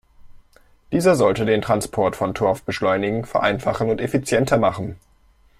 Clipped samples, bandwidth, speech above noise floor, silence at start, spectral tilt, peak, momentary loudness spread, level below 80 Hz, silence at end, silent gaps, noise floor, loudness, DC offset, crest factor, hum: under 0.1%; 15.5 kHz; 36 dB; 0.25 s; -5.5 dB/octave; -2 dBFS; 5 LU; -48 dBFS; 0.65 s; none; -55 dBFS; -20 LUFS; under 0.1%; 18 dB; none